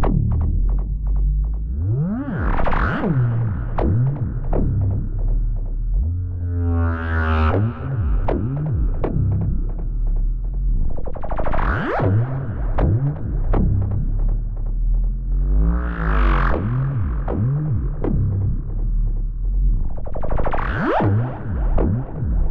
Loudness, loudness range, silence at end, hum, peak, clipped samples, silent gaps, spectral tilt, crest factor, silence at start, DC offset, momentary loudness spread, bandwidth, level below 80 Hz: -22 LUFS; 2 LU; 0 s; none; -6 dBFS; under 0.1%; none; -10.5 dB/octave; 12 dB; 0 s; under 0.1%; 7 LU; 4.2 kHz; -22 dBFS